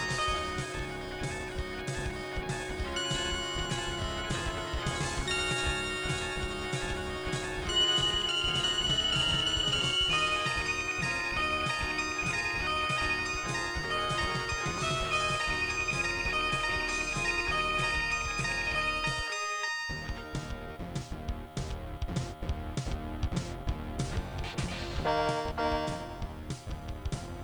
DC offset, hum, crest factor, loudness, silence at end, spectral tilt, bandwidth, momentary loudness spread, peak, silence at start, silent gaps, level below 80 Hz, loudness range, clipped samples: under 0.1%; none; 16 dB; -31 LUFS; 0 s; -3 dB/octave; over 20 kHz; 12 LU; -16 dBFS; 0 s; none; -42 dBFS; 9 LU; under 0.1%